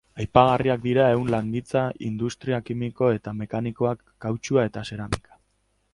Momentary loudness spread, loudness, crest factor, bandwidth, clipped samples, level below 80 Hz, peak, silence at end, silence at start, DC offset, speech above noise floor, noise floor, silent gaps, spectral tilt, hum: 11 LU; -24 LUFS; 24 dB; 11.5 kHz; under 0.1%; -48 dBFS; 0 dBFS; 0.75 s; 0.15 s; under 0.1%; 46 dB; -69 dBFS; none; -7 dB/octave; none